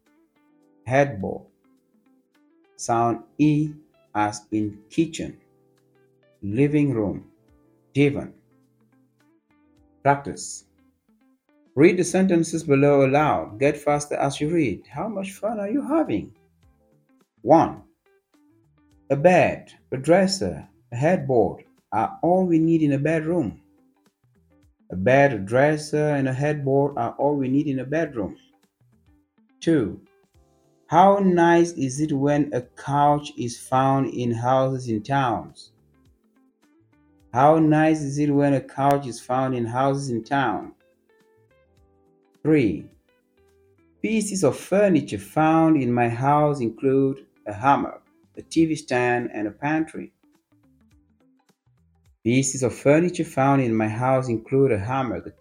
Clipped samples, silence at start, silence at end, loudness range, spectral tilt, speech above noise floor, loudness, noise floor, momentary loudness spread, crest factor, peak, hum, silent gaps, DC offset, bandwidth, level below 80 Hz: under 0.1%; 0.85 s; 0.1 s; 7 LU; -6.5 dB/octave; 42 dB; -22 LUFS; -63 dBFS; 14 LU; 20 dB; -2 dBFS; none; none; under 0.1%; 15 kHz; -58 dBFS